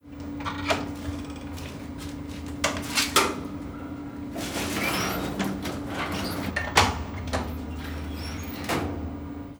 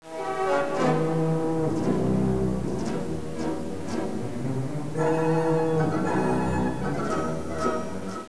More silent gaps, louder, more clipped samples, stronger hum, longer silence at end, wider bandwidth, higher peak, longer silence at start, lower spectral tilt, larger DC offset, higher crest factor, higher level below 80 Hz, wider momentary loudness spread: neither; about the same, -29 LUFS vs -27 LUFS; neither; neither; about the same, 0 s vs 0 s; first, over 20 kHz vs 11 kHz; first, -4 dBFS vs -12 dBFS; about the same, 0.05 s vs 0 s; second, -3.5 dB/octave vs -7 dB/octave; second, under 0.1% vs 2%; first, 26 dB vs 14 dB; about the same, -42 dBFS vs -46 dBFS; first, 15 LU vs 7 LU